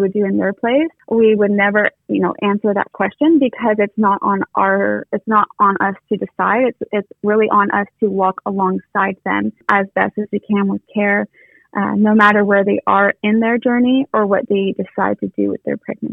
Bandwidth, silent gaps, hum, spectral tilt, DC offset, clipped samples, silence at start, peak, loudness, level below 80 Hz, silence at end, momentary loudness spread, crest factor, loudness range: 4.4 kHz; none; none; -8.5 dB/octave; under 0.1%; under 0.1%; 0 s; 0 dBFS; -16 LUFS; -60 dBFS; 0 s; 7 LU; 16 dB; 3 LU